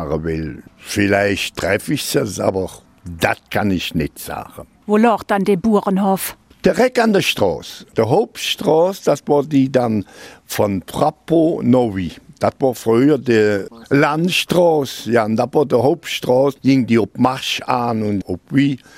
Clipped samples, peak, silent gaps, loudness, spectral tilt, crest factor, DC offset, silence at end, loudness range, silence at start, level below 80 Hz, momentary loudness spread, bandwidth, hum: under 0.1%; 0 dBFS; none; -17 LUFS; -5.5 dB/octave; 16 dB; under 0.1%; 0.2 s; 4 LU; 0 s; -46 dBFS; 10 LU; 16 kHz; none